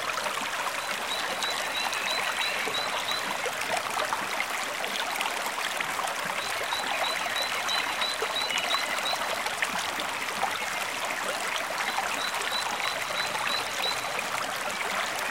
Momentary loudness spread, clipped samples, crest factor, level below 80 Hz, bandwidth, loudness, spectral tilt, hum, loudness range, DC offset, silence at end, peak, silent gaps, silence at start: 3 LU; under 0.1%; 20 dB; -66 dBFS; 16 kHz; -28 LUFS; 0 dB/octave; none; 2 LU; 0.1%; 0 s; -10 dBFS; none; 0 s